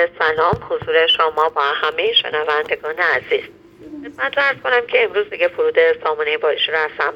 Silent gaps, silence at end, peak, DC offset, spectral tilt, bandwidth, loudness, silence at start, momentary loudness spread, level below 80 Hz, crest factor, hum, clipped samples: none; 0 s; 0 dBFS; under 0.1%; -4.5 dB/octave; 6.4 kHz; -17 LUFS; 0 s; 7 LU; -54 dBFS; 18 dB; none; under 0.1%